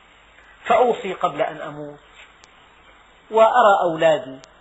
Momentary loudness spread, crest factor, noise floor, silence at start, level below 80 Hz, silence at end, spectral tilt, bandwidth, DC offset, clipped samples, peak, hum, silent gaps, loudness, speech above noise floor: 21 LU; 18 dB; -50 dBFS; 0.65 s; -60 dBFS; 0.2 s; -2.5 dB/octave; 8 kHz; under 0.1%; under 0.1%; -2 dBFS; none; none; -18 LUFS; 32 dB